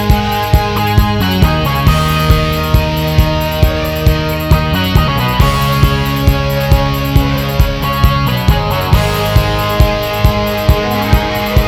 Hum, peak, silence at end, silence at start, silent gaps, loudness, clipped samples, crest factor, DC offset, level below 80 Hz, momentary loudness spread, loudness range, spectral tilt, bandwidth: none; 0 dBFS; 0 s; 0 s; none; -12 LUFS; 0.5%; 12 dB; 0.3%; -16 dBFS; 2 LU; 1 LU; -6 dB/octave; 17 kHz